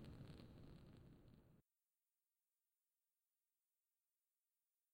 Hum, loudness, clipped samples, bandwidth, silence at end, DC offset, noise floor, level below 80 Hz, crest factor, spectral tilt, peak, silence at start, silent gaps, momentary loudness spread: none; -64 LUFS; under 0.1%; 16 kHz; 3.3 s; under 0.1%; under -90 dBFS; -76 dBFS; 24 dB; -7 dB/octave; -44 dBFS; 0 s; none; 8 LU